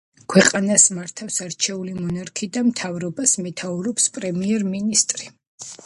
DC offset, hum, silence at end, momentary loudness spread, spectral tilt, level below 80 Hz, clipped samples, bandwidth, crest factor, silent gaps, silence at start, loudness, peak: under 0.1%; none; 0.1 s; 13 LU; -3 dB/octave; -60 dBFS; under 0.1%; 11.5 kHz; 22 dB; 5.47-5.58 s; 0.3 s; -20 LUFS; 0 dBFS